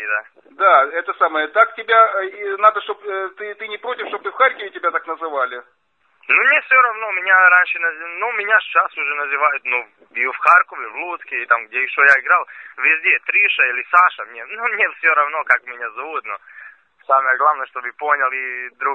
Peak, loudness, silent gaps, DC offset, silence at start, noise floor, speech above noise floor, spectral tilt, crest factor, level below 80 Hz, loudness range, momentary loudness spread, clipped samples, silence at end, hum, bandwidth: 0 dBFS; -16 LUFS; none; under 0.1%; 0 s; -56 dBFS; 39 dB; -2 dB/octave; 18 dB; -78 dBFS; 5 LU; 14 LU; under 0.1%; 0 s; none; 8.4 kHz